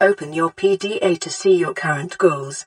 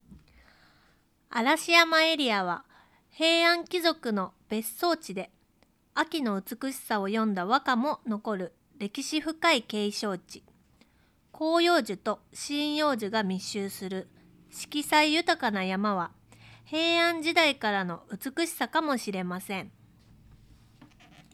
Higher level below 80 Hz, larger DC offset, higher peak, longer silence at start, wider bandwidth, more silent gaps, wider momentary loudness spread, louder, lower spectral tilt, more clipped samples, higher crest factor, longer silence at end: about the same, -68 dBFS vs -68 dBFS; neither; about the same, -2 dBFS vs -4 dBFS; about the same, 0 s vs 0.1 s; second, 11 kHz vs 15.5 kHz; neither; second, 5 LU vs 14 LU; first, -19 LUFS vs -27 LUFS; about the same, -4.5 dB/octave vs -3.5 dB/octave; neither; second, 16 dB vs 24 dB; about the same, 0.05 s vs 0.1 s